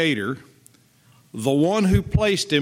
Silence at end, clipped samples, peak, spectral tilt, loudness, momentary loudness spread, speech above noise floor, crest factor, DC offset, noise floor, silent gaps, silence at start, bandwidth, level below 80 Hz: 0 s; under 0.1%; -4 dBFS; -5.5 dB/octave; -21 LUFS; 13 LU; 36 dB; 18 dB; under 0.1%; -56 dBFS; none; 0 s; 16 kHz; -38 dBFS